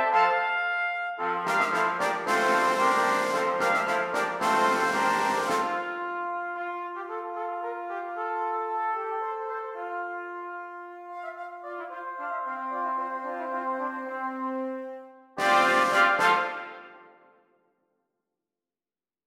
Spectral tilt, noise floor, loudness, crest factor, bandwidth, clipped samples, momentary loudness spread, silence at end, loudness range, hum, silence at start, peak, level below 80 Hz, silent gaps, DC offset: -3 dB/octave; under -90 dBFS; -27 LUFS; 20 dB; 16.5 kHz; under 0.1%; 15 LU; 2.2 s; 10 LU; none; 0 s; -10 dBFS; -76 dBFS; none; under 0.1%